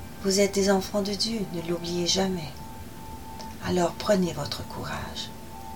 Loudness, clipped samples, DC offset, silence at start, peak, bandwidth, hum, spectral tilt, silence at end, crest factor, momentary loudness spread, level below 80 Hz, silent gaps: -27 LUFS; under 0.1%; 0.6%; 0 s; -8 dBFS; 17.5 kHz; none; -4 dB/octave; 0 s; 20 dB; 18 LU; -48 dBFS; none